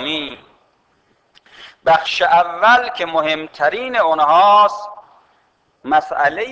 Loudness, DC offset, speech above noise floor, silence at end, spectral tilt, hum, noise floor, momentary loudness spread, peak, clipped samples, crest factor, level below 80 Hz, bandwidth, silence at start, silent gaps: -15 LUFS; under 0.1%; 45 dB; 0 s; -3.5 dB/octave; none; -60 dBFS; 12 LU; -2 dBFS; under 0.1%; 14 dB; -58 dBFS; 8 kHz; 0 s; none